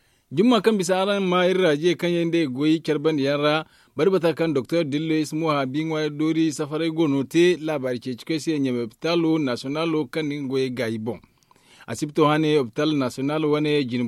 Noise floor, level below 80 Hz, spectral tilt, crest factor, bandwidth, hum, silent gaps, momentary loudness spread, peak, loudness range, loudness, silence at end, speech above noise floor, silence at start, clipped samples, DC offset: -55 dBFS; -66 dBFS; -6 dB/octave; 16 dB; 14 kHz; none; none; 8 LU; -6 dBFS; 4 LU; -22 LUFS; 0 s; 33 dB; 0.3 s; under 0.1%; under 0.1%